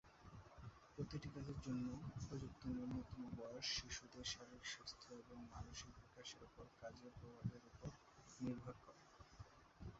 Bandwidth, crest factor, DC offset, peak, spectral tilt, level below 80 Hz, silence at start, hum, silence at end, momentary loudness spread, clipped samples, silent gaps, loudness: 7.6 kHz; 20 dB; under 0.1%; -34 dBFS; -4.5 dB/octave; -66 dBFS; 0.05 s; none; 0 s; 15 LU; under 0.1%; none; -52 LUFS